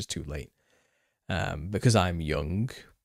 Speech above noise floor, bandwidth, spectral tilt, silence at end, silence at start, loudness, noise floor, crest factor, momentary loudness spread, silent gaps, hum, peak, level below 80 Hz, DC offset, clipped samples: 44 dB; 15 kHz; -5.5 dB/octave; 0.2 s; 0 s; -29 LUFS; -72 dBFS; 22 dB; 15 LU; none; none; -8 dBFS; -44 dBFS; under 0.1%; under 0.1%